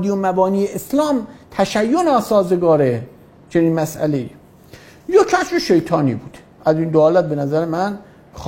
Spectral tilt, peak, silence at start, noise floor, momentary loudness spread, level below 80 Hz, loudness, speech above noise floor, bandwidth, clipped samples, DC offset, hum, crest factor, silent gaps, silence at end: -6.5 dB/octave; 0 dBFS; 0 s; -43 dBFS; 10 LU; -50 dBFS; -17 LUFS; 27 dB; 16.5 kHz; under 0.1%; under 0.1%; none; 16 dB; none; 0 s